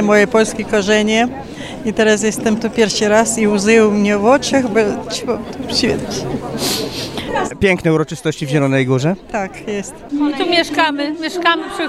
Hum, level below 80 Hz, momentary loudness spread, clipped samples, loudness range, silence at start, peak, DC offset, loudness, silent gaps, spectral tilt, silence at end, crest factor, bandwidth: none; -44 dBFS; 10 LU; under 0.1%; 4 LU; 0 s; 0 dBFS; under 0.1%; -16 LUFS; none; -4.5 dB/octave; 0 s; 16 dB; 15 kHz